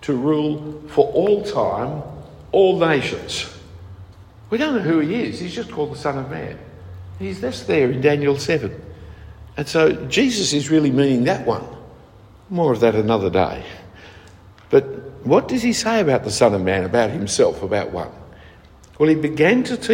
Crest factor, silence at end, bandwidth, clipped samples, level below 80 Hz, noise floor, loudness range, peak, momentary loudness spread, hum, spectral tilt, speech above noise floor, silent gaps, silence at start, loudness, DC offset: 18 dB; 0 s; 16 kHz; under 0.1%; -48 dBFS; -46 dBFS; 5 LU; -2 dBFS; 17 LU; none; -5 dB/octave; 27 dB; none; 0 s; -19 LUFS; under 0.1%